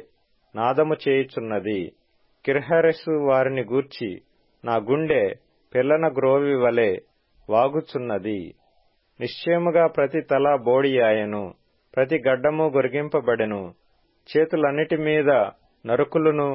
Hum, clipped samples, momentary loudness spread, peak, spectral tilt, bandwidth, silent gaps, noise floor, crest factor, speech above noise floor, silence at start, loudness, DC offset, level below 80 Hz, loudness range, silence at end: none; under 0.1%; 13 LU; -8 dBFS; -11 dB/octave; 5.8 kHz; none; -63 dBFS; 16 dB; 42 dB; 0.55 s; -22 LUFS; under 0.1%; -62 dBFS; 2 LU; 0 s